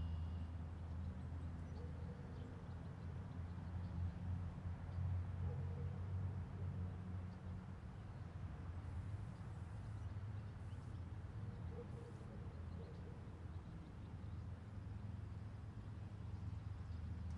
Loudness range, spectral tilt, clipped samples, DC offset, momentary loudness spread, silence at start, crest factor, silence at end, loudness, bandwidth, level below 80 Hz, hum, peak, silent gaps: 6 LU; -8.5 dB/octave; under 0.1%; under 0.1%; 7 LU; 0 s; 14 dB; 0 s; -50 LUFS; 8.4 kHz; -58 dBFS; none; -34 dBFS; none